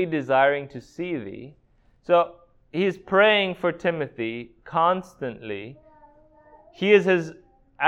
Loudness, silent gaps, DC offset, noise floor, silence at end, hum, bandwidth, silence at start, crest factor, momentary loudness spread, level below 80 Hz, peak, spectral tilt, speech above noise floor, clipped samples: -23 LUFS; none; under 0.1%; -54 dBFS; 0 s; none; 8.2 kHz; 0 s; 22 dB; 19 LU; -62 dBFS; -2 dBFS; -6 dB/octave; 30 dB; under 0.1%